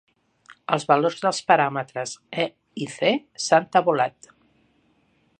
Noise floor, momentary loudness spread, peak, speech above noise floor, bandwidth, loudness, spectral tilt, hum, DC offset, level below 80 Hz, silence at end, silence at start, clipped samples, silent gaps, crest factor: -64 dBFS; 12 LU; -2 dBFS; 42 dB; 9.8 kHz; -23 LUFS; -4 dB/octave; none; under 0.1%; -74 dBFS; 1.3 s; 0.7 s; under 0.1%; none; 22 dB